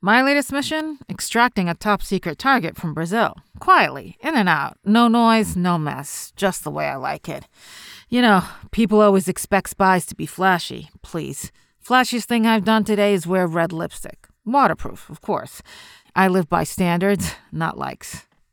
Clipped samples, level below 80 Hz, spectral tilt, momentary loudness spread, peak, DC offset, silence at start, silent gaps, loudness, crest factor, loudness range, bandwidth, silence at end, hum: under 0.1%; -48 dBFS; -5 dB/octave; 17 LU; -4 dBFS; under 0.1%; 0.05 s; none; -19 LUFS; 16 dB; 4 LU; 19.5 kHz; 0.3 s; none